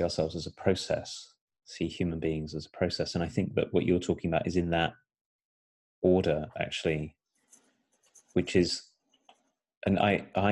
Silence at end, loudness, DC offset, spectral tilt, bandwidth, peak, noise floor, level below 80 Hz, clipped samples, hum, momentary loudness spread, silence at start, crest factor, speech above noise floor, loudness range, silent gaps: 0 s; -30 LUFS; under 0.1%; -6 dB/octave; 11.5 kHz; -10 dBFS; -71 dBFS; -58 dBFS; under 0.1%; none; 9 LU; 0 s; 20 dB; 42 dB; 3 LU; 1.41-1.47 s, 5.21-5.39 s, 5.45-6.02 s, 9.77-9.81 s